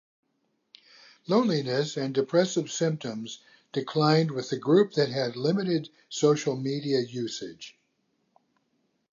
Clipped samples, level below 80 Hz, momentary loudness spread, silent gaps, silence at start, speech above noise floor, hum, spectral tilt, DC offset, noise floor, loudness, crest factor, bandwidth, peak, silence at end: under 0.1%; -78 dBFS; 15 LU; none; 1.3 s; 49 dB; none; -5.5 dB/octave; under 0.1%; -75 dBFS; -27 LUFS; 18 dB; 7.6 kHz; -8 dBFS; 1.45 s